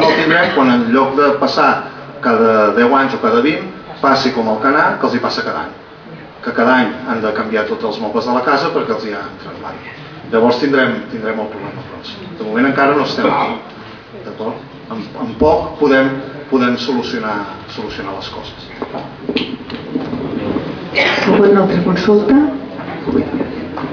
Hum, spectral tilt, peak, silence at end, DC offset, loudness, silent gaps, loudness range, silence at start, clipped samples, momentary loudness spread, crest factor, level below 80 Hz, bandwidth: none; -6 dB/octave; 0 dBFS; 0 s; under 0.1%; -14 LUFS; none; 6 LU; 0 s; under 0.1%; 17 LU; 14 dB; -46 dBFS; 5.4 kHz